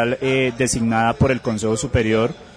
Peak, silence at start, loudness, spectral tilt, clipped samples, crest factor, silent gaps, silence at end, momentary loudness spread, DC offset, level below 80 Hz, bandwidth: -6 dBFS; 0 s; -19 LUFS; -5 dB/octave; under 0.1%; 12 dB; none; 0.05 s; 3 LU; under 0.1%; -38 dBFS; 11 kHz